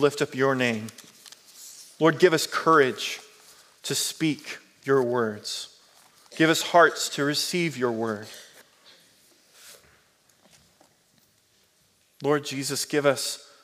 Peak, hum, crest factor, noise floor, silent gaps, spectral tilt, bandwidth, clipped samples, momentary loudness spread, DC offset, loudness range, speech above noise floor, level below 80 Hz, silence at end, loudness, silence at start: -4 dBFS; none; 22 dB; -65 dBFS; none; -3.5 dB/octave; 16 kHz; under 0.1%; 22 LU; under 0.1%; 10 LU; 41 dB; -80 dBFS; 0.25 s; -24 LUFS; 0 s